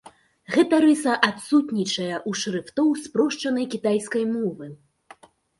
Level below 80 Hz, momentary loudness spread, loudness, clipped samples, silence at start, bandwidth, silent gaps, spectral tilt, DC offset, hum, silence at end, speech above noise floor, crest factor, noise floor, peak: -68 dBFS; 9 LU; -23 LUFS; under 0.1%; 0.5 s; 11.5 kHz; none; -4.5 dB/octave; under 0.1%; none; 0.85 s; 29 dB; 20 dB; -51 dBFS; -2 dBFS